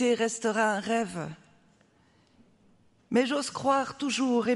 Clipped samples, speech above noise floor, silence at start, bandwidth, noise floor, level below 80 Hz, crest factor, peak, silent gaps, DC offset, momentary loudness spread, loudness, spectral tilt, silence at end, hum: under 0.1%; 37 dB; 0 s; 11.5 kHz; -64 dBFS; -72 dBFS; 18 dB; -12 dBFS; none; under 0.1%; 6 LU; -28 LUFS; -4 dB/octave; 0 s; none